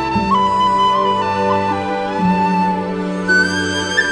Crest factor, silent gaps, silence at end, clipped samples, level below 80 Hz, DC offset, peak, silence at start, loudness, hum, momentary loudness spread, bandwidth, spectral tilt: 14 dB; none; 0 s; under 0.1%; -44 dBFS; under 0.1%; -2 dBFS; 0 s; -16 LUFS; none; 6 LU; 10.5 kHz; -5 dB/octave